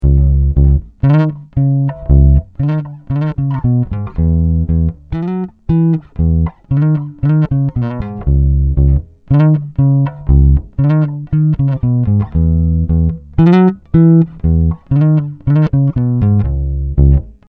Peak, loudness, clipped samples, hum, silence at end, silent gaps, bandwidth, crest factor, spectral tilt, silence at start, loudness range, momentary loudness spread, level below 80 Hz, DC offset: 0 dBFS; -13 LUFS; under 0.1%; none; 0.2 s; none; 4.2 kHz; 12 dB; -12 dB/octave; 0 s; 3 LU; 7 LU; -18 dBFS; under 0.1%